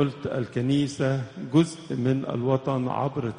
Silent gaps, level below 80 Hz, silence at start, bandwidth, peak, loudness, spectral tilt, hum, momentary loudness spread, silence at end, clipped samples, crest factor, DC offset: none; -60 dBFS; 0 s; 10 kHz; -8 dBFS; -26 LUFS; -7 dB/octave; none; 5 LU; 0 s; under 0.1%; 18 dB; under 0.1%